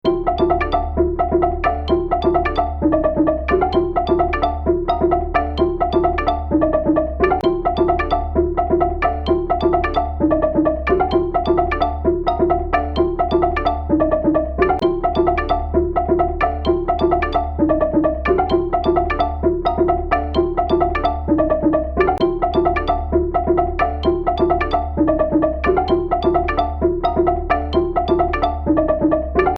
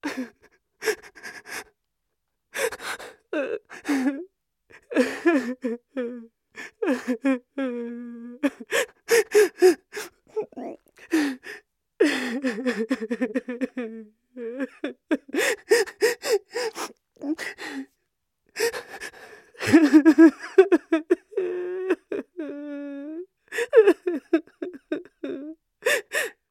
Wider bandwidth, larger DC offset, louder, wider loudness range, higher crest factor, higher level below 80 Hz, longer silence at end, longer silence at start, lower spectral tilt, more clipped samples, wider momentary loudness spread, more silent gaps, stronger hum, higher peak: second, 5.8 kHz vs 16 kHz; first, 0.1% vs under 0.1%; first, -18 LUFS vs -24 LUFS; second, 0 LU vs 11 LU; second, 14 dB vs 22 dB; first, -28 dBFS vs -72 dBFS; second, 0 s vs 0.2 s; about the same, 0.05 s vs 0.05 s; first, -9 dB/octave vs -3.5 dB/octave; neither; second, 3 LU vs 19 LU; neither; neither; about the same, -2 dBFS vs -2 dBFS